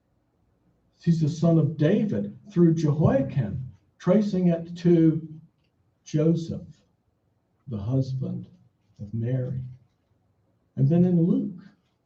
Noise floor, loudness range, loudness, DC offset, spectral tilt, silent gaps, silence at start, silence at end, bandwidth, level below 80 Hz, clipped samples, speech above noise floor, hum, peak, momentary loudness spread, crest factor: -70 dBFS; 9 LU; -24 LUFS; under 0.1%; -9 dB/octave; none; 1.05 s; 0.5 s; 7.4 kHz; -58 dBFS; under 0.1%; 47 dB; none; -8 dBFS; 16 LU; 18 dB